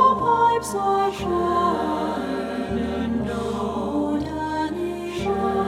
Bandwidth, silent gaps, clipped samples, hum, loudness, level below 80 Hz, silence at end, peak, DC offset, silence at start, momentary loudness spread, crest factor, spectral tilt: 16 kHz; none; under 0.1%; none; -23 LUFS; -44 dBFS; 0 s; -6 dBFS; under 0.1%; 0 s; 8 LU; 16 dB; -6 dB/octave